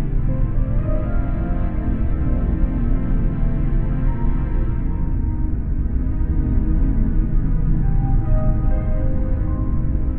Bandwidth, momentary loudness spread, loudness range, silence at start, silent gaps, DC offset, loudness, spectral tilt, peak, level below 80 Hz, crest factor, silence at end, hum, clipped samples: 2.8 kHz; 3 LU; 2 LU; 0 s; none; under 0.1%; -22 LUFS; -12.5 dB/octave; -6 dBFS; -18 dBFS; 12 dB; 0 s; none; under 0.1%